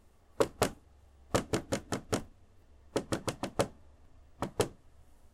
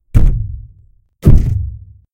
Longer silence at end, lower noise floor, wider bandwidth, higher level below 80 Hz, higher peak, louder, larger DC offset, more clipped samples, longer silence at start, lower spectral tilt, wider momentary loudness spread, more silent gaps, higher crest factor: about the same, 0.3 s vs 0.35 s; first, -59 dBFS vs -48 dBFS; first, 16 kHz vs 3.4 kHz; second, -54 dBFS vs -14 dBFS; second, -12 dBFS vs 0 dBFS; second, -35 LUFS vs -15 LUFS; neither; second, under 0.1% vs 1%; first, 0.4 s vs 0.15 s; second, -4.5 dB/octave vs -9.5 dB/octave; second, 6 LU vs 19 LU; neither; first, 24 dB vs 12 dB